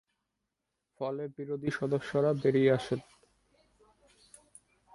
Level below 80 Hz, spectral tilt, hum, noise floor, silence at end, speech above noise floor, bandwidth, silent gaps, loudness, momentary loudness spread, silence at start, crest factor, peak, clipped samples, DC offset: -70 dBFS; -7 dB/octave; none; -85 dBFS; 1.95 s; 55 dB; 11.5 kHz; none; -31 LUFS; 12 LU; 1 s; 22 dB; -12 dBFS; under 0.1%; under 0.1%